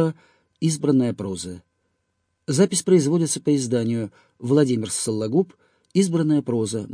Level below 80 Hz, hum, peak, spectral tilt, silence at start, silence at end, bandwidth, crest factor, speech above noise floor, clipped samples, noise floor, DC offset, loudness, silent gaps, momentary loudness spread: -64 dBFS; none; -6 dBFS; -5.5 dB/octave; 0 s; 0 s; 10.5 kHz; 16 dB; 52 dB; under 0.1%; -73 dBFS; under 0.1%; -22 LUFS; none; 13 LU